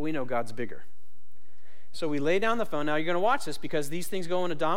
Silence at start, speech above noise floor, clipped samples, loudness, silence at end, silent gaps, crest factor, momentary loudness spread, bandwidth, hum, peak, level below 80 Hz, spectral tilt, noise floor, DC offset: 0 s; 37 dB; under 0.1%; -30 LUFS; 0 s; none; 16 dB; 12 LU; 16.5 kHz; none; -12 dBFS; -64 dBFS; -5 dB/octave; -66 dBFS; 5%